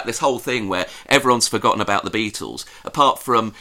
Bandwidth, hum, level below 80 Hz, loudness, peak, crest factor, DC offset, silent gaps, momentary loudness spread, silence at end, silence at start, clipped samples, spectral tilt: 16.5 kHz; none; -54 dBFS; -19 LUFS; 0 dBFS; 20 dB; 0.1%; none; 12 LU; 0 s; 0 s; under 0.1%; -3 dB/octave